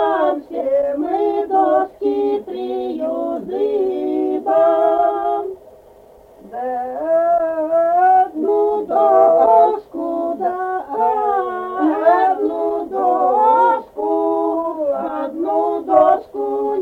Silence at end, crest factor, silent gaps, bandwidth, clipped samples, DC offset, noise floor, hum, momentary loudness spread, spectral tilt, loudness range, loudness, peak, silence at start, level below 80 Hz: 0 s; 16 dB; none; 4.5 kHz; under 0.1%; under 0.1%; -45 dBFS; none; 10 LU; -7 dB/octave; 4 LU; -17 LUFS; -2 dBFS; 0 s; -58 dBFS